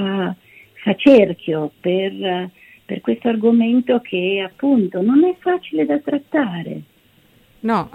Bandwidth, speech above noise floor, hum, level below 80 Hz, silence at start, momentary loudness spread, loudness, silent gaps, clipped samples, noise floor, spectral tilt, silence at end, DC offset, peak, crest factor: 5.8 kHz; 37 dB; none; -60 dBFS; 0 s; 13 LU; -18 LUFS; none; under 0.1%; -54 dBFS; -8 dB/octave; 0.05 s; under 0.1%; -2 dBFS; 16 dB